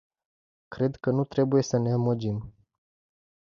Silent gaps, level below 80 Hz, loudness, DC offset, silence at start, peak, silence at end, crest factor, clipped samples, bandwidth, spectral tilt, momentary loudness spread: none; -60 dBFS; -27 LUFS; under 0.1%; 0.7 s; -12 dBFS; 0.95 s; 16 dB; under 0.1%; 7.4 kHz; -7.5 dB/octave; 9 LU